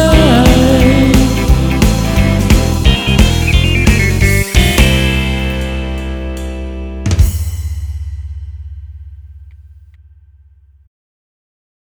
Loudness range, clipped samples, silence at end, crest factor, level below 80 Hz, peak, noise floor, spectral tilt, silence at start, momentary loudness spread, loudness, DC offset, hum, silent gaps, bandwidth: 16 LU; 0.4%; 2.25 s; 12 dB; -16 dBFS; 0 dBFS; -45 dBFS; -5.5 dB/octave; 0 s; 16 LU; -12 LUFS; under 0.1%; none; none; over 20 kHz